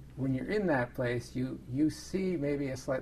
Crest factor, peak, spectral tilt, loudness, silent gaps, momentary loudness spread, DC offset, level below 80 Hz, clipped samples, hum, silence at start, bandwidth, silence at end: 16 dB; -16 dBFS; -7 dB/octave; -33 LUFS; none; 5 LU; under 0.1%; -54 dBFS; under 0.1%; none; 0 s; 14 kHz; 0 s